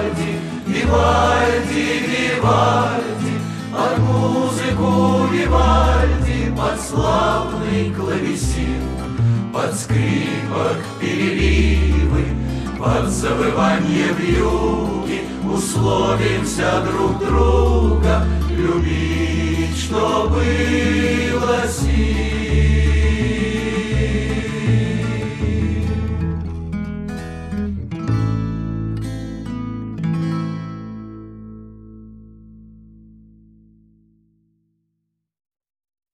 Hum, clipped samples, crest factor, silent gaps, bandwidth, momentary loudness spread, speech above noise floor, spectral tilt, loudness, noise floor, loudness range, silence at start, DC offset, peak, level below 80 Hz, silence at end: none; under 0.1%; 16 dB; none; 13 kHz; 10 LU; 58 dB; -6 dB/octave; -19 LUFS; -75 dBFS; 7 LU; 0 s; under 0.1%; -2 dBFS; -24 dBFS; 3.45 s